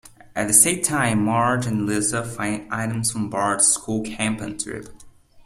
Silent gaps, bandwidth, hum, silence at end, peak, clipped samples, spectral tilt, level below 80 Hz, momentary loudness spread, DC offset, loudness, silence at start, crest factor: none; 15.5 kHz; none; 0.35 s; 0 dBFS; under 0.1%; -3.5 dB/octave; -52 dBFS; 13 LU; under 0.1%; -20 LUFS; 0.05 s; 22 dB